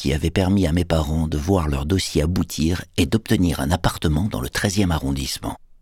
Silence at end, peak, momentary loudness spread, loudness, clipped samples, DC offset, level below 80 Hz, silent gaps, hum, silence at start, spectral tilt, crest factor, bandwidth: 0.25 s; -4 dBFS; 4 LU; -21 LUFS; under 0.1%; under 0.1%; -30 dBFS; none; none; 0 s; -5.5 dB/octave; 18 dB; 17.5 kHz